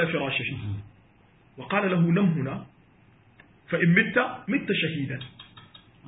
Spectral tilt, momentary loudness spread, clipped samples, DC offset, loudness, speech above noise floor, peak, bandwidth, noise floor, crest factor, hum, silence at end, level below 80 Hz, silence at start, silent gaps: -11 dB/octave; 17 LU; under 0.1%; under 0.1%; -25 LUFS; 33 dB; -4 dBFS; 4 kHz; -58 dBFS; 22 dB; none; 0 s; -58 dBFS; 0 s; none